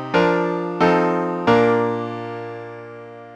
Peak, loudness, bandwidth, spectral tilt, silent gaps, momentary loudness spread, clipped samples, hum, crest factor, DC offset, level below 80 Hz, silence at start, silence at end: -2 dBFS; -19 LUFS; 8.4 kHz; -7 dB/octave; none; 19 LU; under 0.1%; none; 18 dB; under 0.1%; -56 dBFS; 0 s; 0 s